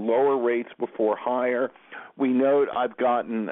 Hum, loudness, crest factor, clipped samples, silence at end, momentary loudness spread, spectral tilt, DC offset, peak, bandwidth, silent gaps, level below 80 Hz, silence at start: none; -24 LUFS; 12 dB; under 0.1%; 0 s; 10 LU; -10 dB/octave; under 0.1%; -12 dBFS; 3.9 kHz; none; -76 dBFS; 0 s